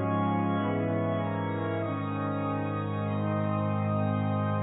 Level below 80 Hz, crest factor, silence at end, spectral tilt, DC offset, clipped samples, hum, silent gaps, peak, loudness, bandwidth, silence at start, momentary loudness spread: -56 dBFS; 12 dB; 0 s; -12 dB/octave; under 0.1%; under 0.1%; none; none; -18 dBFS; -30 LUFS; 4 kHz; 0 s; 3 LU